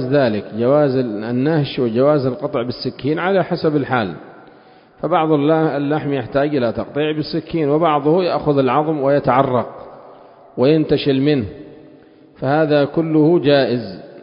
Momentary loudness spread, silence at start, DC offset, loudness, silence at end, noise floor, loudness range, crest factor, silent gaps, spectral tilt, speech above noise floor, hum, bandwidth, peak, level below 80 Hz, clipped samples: 8 LU; 0 s; under 0.1%; -17 LUFS; 0 s; -46 dBFS; 2 LU; 18 dB; none; -11.5 dB/octave; 30 dB; none; 5.4 kHz; 0 dBFS; -50 dBFS; under 0.1%